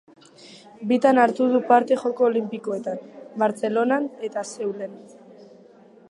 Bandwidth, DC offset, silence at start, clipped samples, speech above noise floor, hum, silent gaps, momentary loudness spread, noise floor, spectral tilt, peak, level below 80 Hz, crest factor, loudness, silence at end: 11.5 kHz; under 0.1%; 0.45 s; under 0.1%; 29 dB; none; none; 16 LU; -50 dBFS; -5.5 dB/octave; -2 dBFS; -80 dBFS; 20 dB; -22 LUFS; 0.65 s